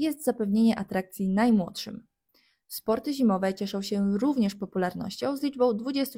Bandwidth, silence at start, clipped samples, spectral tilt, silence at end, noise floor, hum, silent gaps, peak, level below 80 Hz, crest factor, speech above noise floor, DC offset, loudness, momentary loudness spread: 16.5 kHz; 0 s; under 0.1%; -6 dB/octave; 0 s; -68 dBFS; none; none; -12 dBFS; -62 dBFS; 16 dB; 42 dB; under 0.1%; -27 LUFS; 10 LU